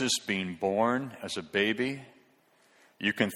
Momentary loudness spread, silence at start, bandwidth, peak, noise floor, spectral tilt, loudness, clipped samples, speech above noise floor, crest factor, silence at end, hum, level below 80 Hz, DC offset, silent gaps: 8 LU; 0 s; 17 kHz; -10 dBFS; -65 dBFS; -3.5 dB/octave; -30 LUFS; under 0.1%; 35 dB; 22 dB; 0 s; none; -70 dBFS; under 0.1%; none